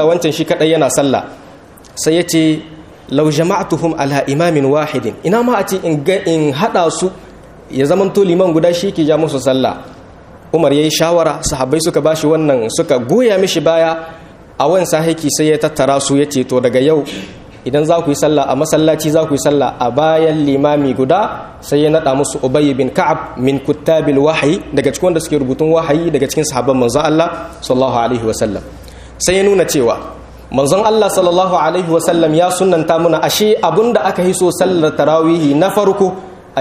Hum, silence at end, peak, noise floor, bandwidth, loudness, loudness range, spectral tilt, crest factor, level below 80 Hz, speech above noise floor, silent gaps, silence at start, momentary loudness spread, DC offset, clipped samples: none; 0 s; 0 dBFS; -38 dBFS; 15.5 kHz; -13 LUFS; 3 LU; -5 dB/octave; 12 dB; -42 dBFS; 25 dB; none; 0 s; 6 LU; under 0.1%; under 0.1%